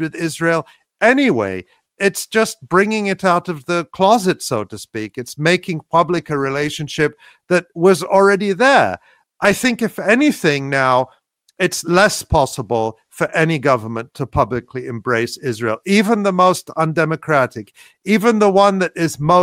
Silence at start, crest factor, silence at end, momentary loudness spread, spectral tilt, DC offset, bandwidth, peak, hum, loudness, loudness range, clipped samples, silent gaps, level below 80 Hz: 0 s; 16 dB; 0 s; 10 LU; -5 dB/octave; under 0.1%; 16.5 kHz; 0 dBFS; none; -16 LUFS; 4 LU; under 0.1%; none; -44 dBFS